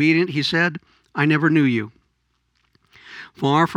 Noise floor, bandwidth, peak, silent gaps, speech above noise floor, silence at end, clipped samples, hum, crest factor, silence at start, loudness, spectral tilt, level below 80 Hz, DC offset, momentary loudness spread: -69 dBFS; 10.5 kHz; -4 dBFS; none; 50 dB; 0 s; under 0.1%; none; 18 dB; 0 s; -19 LUFS; -6.5 dB/octave; -66 dBFS; under 0.1%; 22 LU